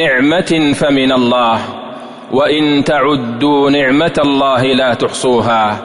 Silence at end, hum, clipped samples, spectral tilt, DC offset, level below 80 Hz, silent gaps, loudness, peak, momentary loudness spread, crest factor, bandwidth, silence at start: 0 s; none; under 0.1%; -5 dB/octave; under 0.1%; -44 dBFS; none; -12 LUFS; -2 dBFS; 6 LU; 10 dB; 11 kHz; 0 s